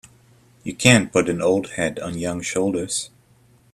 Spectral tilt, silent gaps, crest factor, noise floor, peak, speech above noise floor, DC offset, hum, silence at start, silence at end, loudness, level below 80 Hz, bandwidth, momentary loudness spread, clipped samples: -4 dB/octave; none; 22 dB; -55 dBFS; 0 dBFS; 35 dB; under 0.1%; none; 0.65 s; 0.65 s; -20 LUFS; -52 dBFS; 15 kHz; 14 LU; under 0.1%